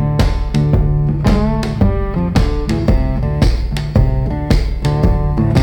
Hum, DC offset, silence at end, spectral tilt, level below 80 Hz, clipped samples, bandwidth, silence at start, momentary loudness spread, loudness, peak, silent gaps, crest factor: none; under 0.1%; 0 s; -7.5 dB/octave; -18 dBFS; under 0.1%; 16.5 kHz; 0 s; 3 LU; -16 LUFS; 0 dBFS; none; 14 dB